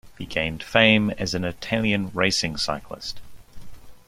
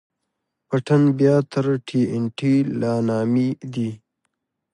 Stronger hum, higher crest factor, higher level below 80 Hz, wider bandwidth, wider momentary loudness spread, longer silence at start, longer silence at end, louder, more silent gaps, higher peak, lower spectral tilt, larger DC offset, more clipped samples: neither; first, 22 dB vs 16 dB; first, -48 dBFS vs -64 dBFS; first, 15.5 kHz vs 10.5 kHz; first, 17 LU vs 9 LU; second, 0.05 s vs 0.7 s; second, 0.1 s vs 0.8 s; about the same, -22 LUFS vs -21 LUFS; neither; first, -2 dBFS vs -6 dBFS; second, -4 dB/octave vs -8 dB/octave; neither; neither